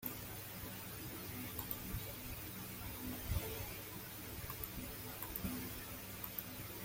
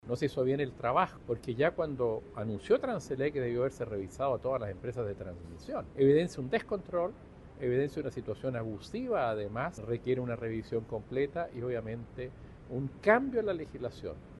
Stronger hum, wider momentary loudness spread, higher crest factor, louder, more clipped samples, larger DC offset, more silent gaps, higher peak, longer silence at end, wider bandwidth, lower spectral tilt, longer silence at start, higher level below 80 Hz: neither; second, 5 LU vs 12 LU; about the same, 24 dB vs 22 dB; second, -45 LUFS vs -33 LUFS; neither; neither; neither; second, -22 dBFS vs -12 dBFS; about the same, 0 s vs 0 s; first, 17 kHz vs 12 kHz; second, -4 dB/octave vs -7 dB/octave; about the same, 0 s vs 0.05 s; about the same, -56 dBFS vs -56 dBFS